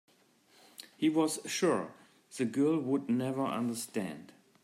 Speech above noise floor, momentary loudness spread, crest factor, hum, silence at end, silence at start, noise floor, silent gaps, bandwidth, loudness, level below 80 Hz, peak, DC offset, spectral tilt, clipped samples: 34 dB; 19 LU; 16 dB; none; 0.4 s; 0.8 s; -66 dBFS; none; 15.5 kHz; -32 LUFS; -80 dBFS; -18 dBFS; under 0.1%; -5 dB/octave; under 0.1%